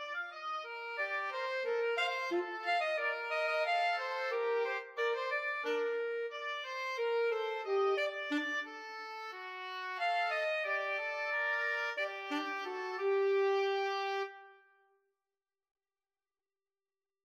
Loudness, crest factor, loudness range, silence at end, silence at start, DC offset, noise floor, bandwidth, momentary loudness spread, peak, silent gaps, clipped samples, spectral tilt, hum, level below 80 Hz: -35 LUFS; 14 dB; 2 LU; 2.7 s; 0 s; under 0.1%; under -90 dBFS; 14 kHz; 9 LU; -22 dBFS; none; under 0.1%; -1 dB/octave; none; under -90 dBFS